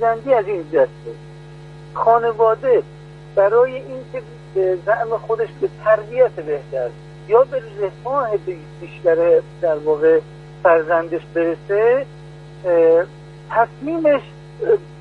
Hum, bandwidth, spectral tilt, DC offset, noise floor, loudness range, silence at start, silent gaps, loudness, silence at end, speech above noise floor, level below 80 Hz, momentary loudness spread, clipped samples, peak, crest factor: none; 5.6 kHz; -8 dB/octave; under 0.1%; -38 dBFS; 2 LU; 0 s; none; -18 LUFS; 0 s; 20 dB; -52 dBFS; 18 LU; under 0.1%; -2 dBFS; 16 dB